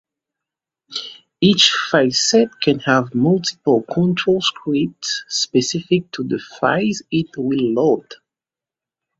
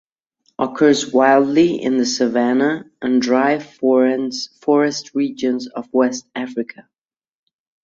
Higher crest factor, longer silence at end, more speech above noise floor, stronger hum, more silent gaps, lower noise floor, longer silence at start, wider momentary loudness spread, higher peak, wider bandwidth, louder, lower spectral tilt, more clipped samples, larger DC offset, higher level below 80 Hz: about the same, 18 dB vs 16 dB; about the same, 1.05 s vs 1.05 s; first, 72 dB vs 48 dB; neither; neither; first, -89 dBFS vs -65 dBFS; first, 0.9 s vs 0.6 s; about the same, 10 LU vs 11 LU; about the same, 0 dBFS vs -2 dBFS; about the same, 8 kHz vs 7.8 kHz; about the same, -17 LUFS vs -18 LUFS; about the same, -4 dB/octave vs -4.5 dB/octave; neither; neither; first, -58 dBFS vs -64 dBFS